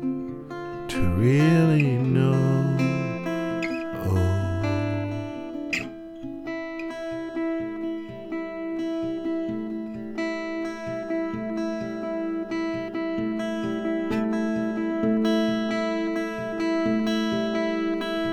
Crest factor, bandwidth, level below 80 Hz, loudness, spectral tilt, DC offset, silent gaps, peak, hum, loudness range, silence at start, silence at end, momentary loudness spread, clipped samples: 16 dB; 15.5 kHz; -50 dBFS; -26 LUFS; -7.5 dB/octave; under 0.1%; none; -8 dBFS; none; 8 LU; 0 s; 0 s; 11 LU; under 0.1%